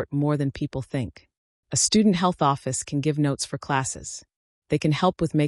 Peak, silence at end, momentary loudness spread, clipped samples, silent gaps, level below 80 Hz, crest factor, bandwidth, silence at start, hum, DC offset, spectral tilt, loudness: -8 dBFS; 0 s; 12 LU; under 0.1%; 1.38-1.63 s, 4.36-4.62 s; -52 dBFS; 16 dB; 12 kHz; 0 s; none; under 0.1%; -5 dB/octave; -24 LUFS